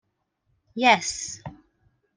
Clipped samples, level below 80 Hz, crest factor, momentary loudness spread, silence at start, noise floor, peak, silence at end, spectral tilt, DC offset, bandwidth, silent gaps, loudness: under 0.1%; -60 dBFS; 24 dB; 20 LU; 0.75 s; -73 dBFS; -4 dBFS; 0.6 s; -2 dB/octave; under 0.1%; 10.5 kHz; none; -22 LUFS